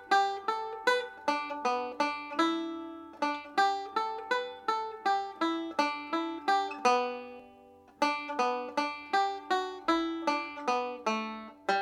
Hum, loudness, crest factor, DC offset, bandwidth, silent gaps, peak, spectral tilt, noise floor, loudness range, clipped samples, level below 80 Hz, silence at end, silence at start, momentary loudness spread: none; -31 LUFS; 18 dB; under 0.1%; 15.5 kHz; none; -12 dBFS; -2.5 dB/octave; -56 dBFS; 1 LU; under 0.1%; -76 dBFS; 0 s; 0 s; 6 LU